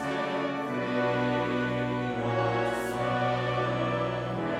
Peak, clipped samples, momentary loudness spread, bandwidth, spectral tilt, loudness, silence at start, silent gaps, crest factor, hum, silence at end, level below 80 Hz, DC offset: -16 dBFS; under 0.1%; 3 LU; 14.5 kHz; -6.5 dB/octave; -29 LUFS; 0 s; none; 14 dB; none; 0 s; -56 dBFS; under 0.1%